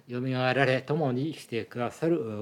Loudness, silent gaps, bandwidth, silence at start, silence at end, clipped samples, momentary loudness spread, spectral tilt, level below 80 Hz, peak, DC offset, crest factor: -28 LUFS; none; 14 kHz; 0.1 s; 0 s; under 0.1%; 9 LU; -7 dB/octave; -76 dBFS; -10 dBFS; under 0.1%; 20 dB